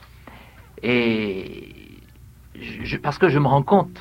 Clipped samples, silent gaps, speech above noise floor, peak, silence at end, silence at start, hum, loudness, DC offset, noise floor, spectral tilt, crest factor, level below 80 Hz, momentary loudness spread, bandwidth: under 0.1%; none; 27 dB; -2 dBFS; 0 s; 0.25 s; none; -21 LUFS; under 0.1%; -46 dBFS; -8 dB/octave; 20 dB; -48 dBFS; 20 LU; 15.5 kHz